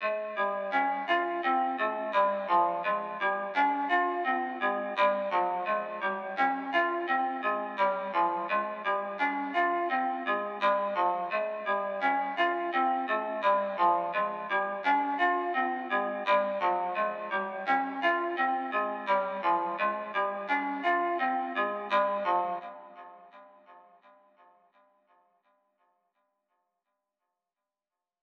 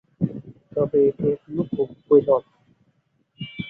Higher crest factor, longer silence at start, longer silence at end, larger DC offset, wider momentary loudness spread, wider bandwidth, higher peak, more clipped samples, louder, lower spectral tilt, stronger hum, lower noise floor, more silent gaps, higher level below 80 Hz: about the same, 18 dB vs 20 dB; second, 0 s vs 0.2 s; first, 4.4 s vs 0 s; neither; second, 4 LU vs 16 LU; first, 6.8 kHz vs 4 kHz; second, -12 dBFS vs -4 dBFS; neither; second, -29 LUFS vs -22 LUFS; second, -5.5 dB/octave vs -10.5 dB/octave; neither; first, under -90 dBFS vs -66 dBFS; neither; second, under -90 dBFS vs -58 dBFS